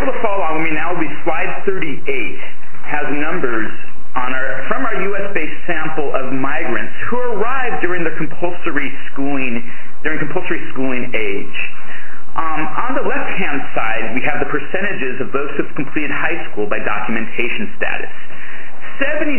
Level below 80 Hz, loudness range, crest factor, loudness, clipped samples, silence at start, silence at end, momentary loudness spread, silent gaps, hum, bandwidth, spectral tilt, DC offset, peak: -50 dBFS; 2 LU; 18 dB; -21 LUFS; under 0.1%; 0 s; 0 s; 7 LU; none; none; 3.2 kHz; -8.5 dB/octave; 40%; 0 dBFS